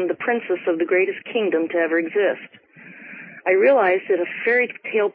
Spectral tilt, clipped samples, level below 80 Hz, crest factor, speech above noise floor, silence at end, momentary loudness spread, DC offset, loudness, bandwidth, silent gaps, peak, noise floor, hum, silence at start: -9.5 dB/octave; under 0.1%; -78 dBFS; 14 dB; 22 dB; 0.05 s; 14 LU; under 0.1%; -20 LUFS; 4.6 kHz; none; -6 dBFS; -42 dBFS; none; 0 s